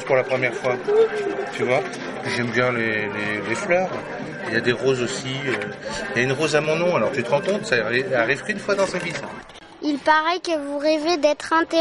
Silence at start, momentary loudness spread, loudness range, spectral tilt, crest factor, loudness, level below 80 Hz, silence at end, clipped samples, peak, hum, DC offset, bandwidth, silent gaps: 0 s; 9 LU; 2 LU; -4.5 dB/octave; 18 dB; -22 LUFS; -58 dBFS; 0 s; under 0.1%; -4 dBFS; none; under 0.1%; 11.5 kHz; none